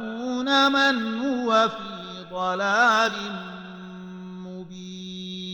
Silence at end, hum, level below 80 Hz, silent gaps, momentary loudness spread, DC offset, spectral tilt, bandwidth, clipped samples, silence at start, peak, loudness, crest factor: 0 s; none; -64 dBFS; none; 20 LU; under 0.1%; -4 dB/octave; 16.5 kHz; under 0.1%; 0 s; -8 dBFS; -22 LUFS; 18 dB